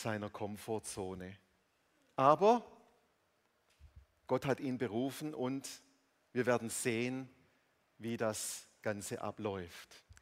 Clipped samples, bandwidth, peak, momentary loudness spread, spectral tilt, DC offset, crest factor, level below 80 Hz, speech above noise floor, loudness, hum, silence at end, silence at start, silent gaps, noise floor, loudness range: under 0.1%; 16 kHz; -12 dBFS; 18 LU; -5 dB/octave; under 0.1%; 26 dB; -72 dBFS; 40 dB; -37 LUFS; none; 0.1 s; 0 s; none; -77 dBFS; 5 LU